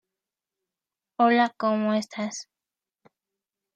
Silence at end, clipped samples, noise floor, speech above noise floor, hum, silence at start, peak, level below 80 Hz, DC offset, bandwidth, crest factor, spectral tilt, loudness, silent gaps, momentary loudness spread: 1.35 s; under 0.1%; -90 dBFS; 66 dB; none; 1.2 s; -8 dBFS; -82 dBFS; under 0.1%; 9.6 kHz; 20 dB; -4.5 dB/octave; -24 LUFS; none; 16 LU